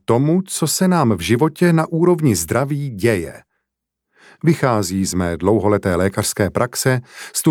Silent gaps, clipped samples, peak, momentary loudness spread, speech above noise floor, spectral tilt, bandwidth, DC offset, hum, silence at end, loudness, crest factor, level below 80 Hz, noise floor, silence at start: none; under 0.1%; -2 dBFS; 5 LU; 62 dB; -5.5 dB/octave; 18.5 kHz; under 0.1%; none; 0 s; -17 LUFS; 16 dB; -46 dBFS; -79 dBFS; 0.1 s